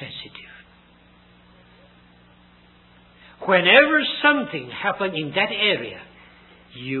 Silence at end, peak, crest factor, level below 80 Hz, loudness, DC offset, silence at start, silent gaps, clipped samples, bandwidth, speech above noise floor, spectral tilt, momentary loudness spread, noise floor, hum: 0 s; 0 dBFS; 24 dB; -60 dBFS; -19 LUFS; under 0.1%; 0 s; none; under 0.1%; 4.3 kHz; 33 dB; -8.5 dB/octave; 23 LU; -53 dBFS; 60 Hz at -60 dBFS